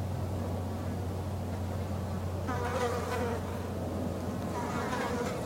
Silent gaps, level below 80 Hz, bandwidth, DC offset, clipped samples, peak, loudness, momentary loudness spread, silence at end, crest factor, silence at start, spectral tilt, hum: none; -50 dBFS; 16 kHz; under 0.1%; under 0.1%; -20 dBFS; -35 LUFS; 4 LU; 0 s; 14 dB; 0 s; -6.5 dB/octave; none